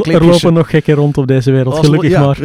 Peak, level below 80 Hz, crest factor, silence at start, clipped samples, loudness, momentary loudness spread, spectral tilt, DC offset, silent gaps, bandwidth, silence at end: 0 dBFS; -36 dBFS; 10 dB; 0 s; 0.7%; -10 LUFS; 4 LU; -7 dB/octave; under 0.1%; none; 14 kHz; 0 s